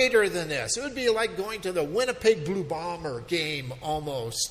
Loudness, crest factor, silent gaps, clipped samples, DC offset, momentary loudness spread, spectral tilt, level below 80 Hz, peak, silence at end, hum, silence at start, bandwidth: -27 LUFS; 18 dB; none; under 0.1%; under 0.1%; 8 LU; -3.5 dB/octave; -54 dBFS; -8 dBFS; 0 s; none; 0 s; 15.5 kHz